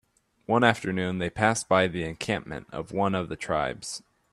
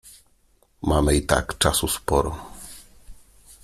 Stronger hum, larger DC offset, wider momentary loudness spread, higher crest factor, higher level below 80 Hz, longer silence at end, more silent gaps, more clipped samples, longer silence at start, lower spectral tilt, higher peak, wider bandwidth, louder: neither; neither; second, 14 LU vs 20 LU; about the same, 24 dB vs 22 dB; second, -56 dBFS vs -34 dBFS; second, 0.35 s vs 0.5 s; neither; neither; first, 0.5 s vs 0.05 s; about the same, -4.5 dB/octave vs -4 dB/octave; about the same, -4 dBFS vs -2 dBFS; second, 13 kHz vs 16 kHz; second, -27 LUFS vs -22 LUFS